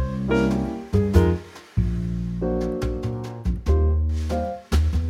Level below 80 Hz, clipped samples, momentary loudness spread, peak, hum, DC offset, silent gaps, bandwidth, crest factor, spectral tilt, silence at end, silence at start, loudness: -26 dBFS; under 0.1%; 9 LU; -4 dBFS; none; under 0.1%; none; 12.5 kHz; 18 dB; -8 dB/octave; 0 s; 0 s; -24 LUFS